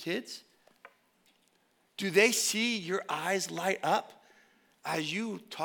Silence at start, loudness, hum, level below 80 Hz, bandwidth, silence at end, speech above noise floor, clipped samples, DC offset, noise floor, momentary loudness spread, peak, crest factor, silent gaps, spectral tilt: 0 s; -30 LUFS; none; under -90 dBFS; 19 kHz; 0 s; 40 dB; under 0.1%; under 0.1%; -71 dBFS; 16 LU; -10 dBFS; 24 dB; none; -2.5 dB/octave